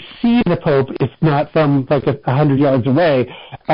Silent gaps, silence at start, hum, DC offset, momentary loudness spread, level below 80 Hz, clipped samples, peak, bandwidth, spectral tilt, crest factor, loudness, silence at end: none; 0 s; none; under 0.1%; 5 LU; -46 dBFS; under 0.1%; -6 dBFS; 5.4 kHz; -6.5 dB/octave; 10 dB; -15 LUFS; 0 s